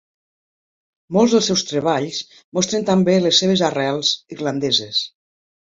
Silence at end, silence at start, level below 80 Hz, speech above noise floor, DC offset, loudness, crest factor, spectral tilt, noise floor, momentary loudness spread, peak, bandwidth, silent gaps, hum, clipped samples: 0.6 s; 1.1 s; -60 dBFS; over 72 dB; under 0.1%; -18 LUFS; 18 dB; -4 dB/octave; under -90 dBFS; 10 LU; -2 dBFS; 7.8 kHz; 2.44-2.52 s; none; under 0.1%